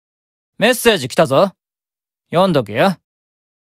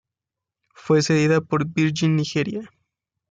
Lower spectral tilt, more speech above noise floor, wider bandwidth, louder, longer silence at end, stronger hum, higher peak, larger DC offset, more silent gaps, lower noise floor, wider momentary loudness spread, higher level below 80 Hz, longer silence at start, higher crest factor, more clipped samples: second, -4.5 dB/octave vs -6 dB/octave; first, over 76 dB vs 67 dB; first, 16 kHz vs 9 kHz; first, -15 LUFS vs -21 LUFS; about the same, 0.65 s vs 0.65 s; neither; first, 0 dBFS vs -8 dBFS; neither; neither; about the same, under -90 dBFS vs -87 dBFS; about the same, 6 LU vs 7 LU; first, -52 dBFS vs -62 dBFS; second, 0.6 s vs 0.85 s; about the same, 18 dB vs 14 dB; neither